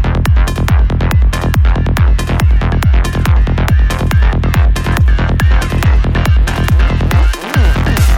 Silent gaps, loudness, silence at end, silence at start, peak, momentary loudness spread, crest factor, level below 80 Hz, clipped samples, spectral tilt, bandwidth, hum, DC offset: none; -12 LUFS; 0 s; 0 s; 0 dBFS; 1 LU; 8 dB; -12 dBFS; under 0.1%; -6 dB/octave; 17 kHz; none; under 0.1%